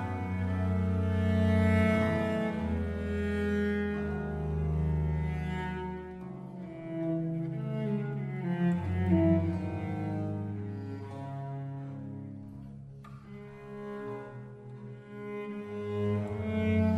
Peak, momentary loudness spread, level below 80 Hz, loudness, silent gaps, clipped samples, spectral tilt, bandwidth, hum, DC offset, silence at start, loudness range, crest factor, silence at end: -14 dBFS; 18 LU; -46 dBFS; -32 LUFS; none; under 0.1%; -9 dB/octave; 10 kHz; none; under 0.1%; 0 s; 13 LU; 18 dB; 0 s